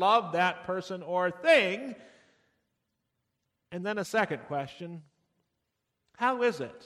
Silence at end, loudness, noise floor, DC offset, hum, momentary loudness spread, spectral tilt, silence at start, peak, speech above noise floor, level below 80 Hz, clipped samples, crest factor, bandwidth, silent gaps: 0.05 s; -29 LUFS; -82 dBFS; under 0.1%; none; 20 LU; -4.5 dB/octave; 0 s; -10 dBFS; 53 dB; -76 dBFS; under 0.1%; 20 dB; 14.5 kHz; none